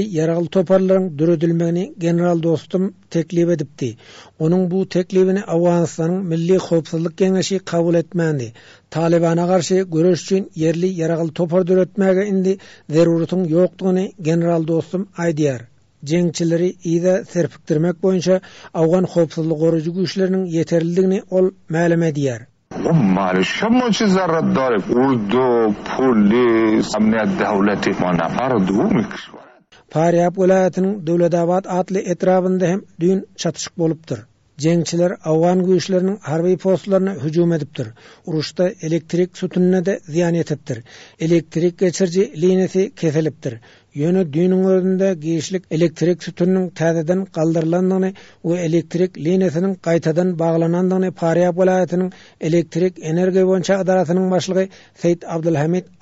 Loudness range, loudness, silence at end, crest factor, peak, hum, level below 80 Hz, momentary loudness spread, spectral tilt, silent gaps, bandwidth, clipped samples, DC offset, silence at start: 3 LU; -18 LUFS; 0.2 s; 12 dB; -4 dBFS; none; -56 dBFS; 7 LU; -7 dB/octave; none; 8 kHz; under 0.1%; under 0.1%; 0 s